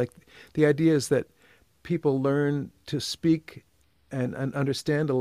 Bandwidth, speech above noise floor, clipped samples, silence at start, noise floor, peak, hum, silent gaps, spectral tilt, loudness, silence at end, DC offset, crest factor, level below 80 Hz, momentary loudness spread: 15 kHz; 35 dB; under 0.1%; 0 s; -61 dBFS; -8 dBFS; none; none; -6 dB/octave; -27 LUFS; 0 s; under 0.1%; 18 dB; -62 dBFS; 11 LU